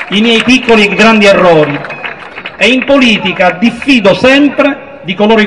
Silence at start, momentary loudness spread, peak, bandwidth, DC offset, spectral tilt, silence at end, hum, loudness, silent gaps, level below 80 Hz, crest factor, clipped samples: 0 s; 15 LU; 0 dBFS; 12 kHz; 0.8%; -5 dB/octave; 0 s; none; -7 LUFS; none; -40 dBFS; 8 dB; 2%